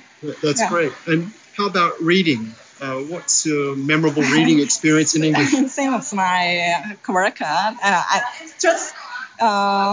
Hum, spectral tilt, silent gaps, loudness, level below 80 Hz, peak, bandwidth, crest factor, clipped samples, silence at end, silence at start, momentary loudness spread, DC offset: none; -3.5 dB/octave; none; -18 LUFS; -72 dBFS; -2 dBFS; 7.8 kHz; 16 dB; under 0.1%; 0 s; 0.2 s; 11 LU; under 0.1%